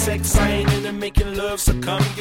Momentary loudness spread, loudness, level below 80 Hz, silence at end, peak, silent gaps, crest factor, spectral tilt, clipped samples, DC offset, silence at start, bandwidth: 5 LU; -20 LUFS; -24 dBFS; 0 s; -2 dBFS; none; 16 dB; -4.5 dB/octave; under 0.1%; under 0.1%; 0 s; 17 kHz